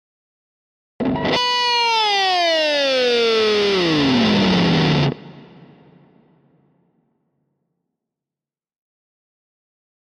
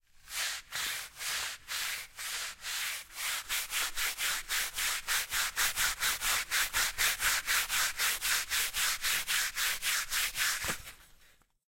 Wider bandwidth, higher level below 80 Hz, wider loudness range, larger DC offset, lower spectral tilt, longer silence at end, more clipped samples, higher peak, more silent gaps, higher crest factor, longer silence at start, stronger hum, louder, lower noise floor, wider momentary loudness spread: second, 14 kHz vs 16.5 kHz; about the same, -50 dBFS vs -54 dBFS; about the same, 7 LU vs 6 LU; neither; first, -5 dB/octave vs 2 dB/octave; first, 4.6 s vs 0.6 s; neither; first, -6 dBFS vs -16 dBFS; neither; about the same, 14 dB vs 18 dB; first, 1 s vs 0.25 s; neither; first, -17 LUFS vs -31 LUFS; first, -90 dBFS vs -64 dBFS; second, 5 LU vs 8 LU